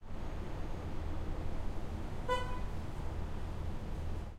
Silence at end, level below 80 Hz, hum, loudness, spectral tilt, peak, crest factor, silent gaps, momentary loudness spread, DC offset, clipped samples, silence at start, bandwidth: 0 s; -42 dBFS; none; -42 LUFS; -6.5 dB/octave; -22 dBFS; 16 dB; none; 6 LU; under 0.1%; under 0.1%; 0 s; 10.5 kHz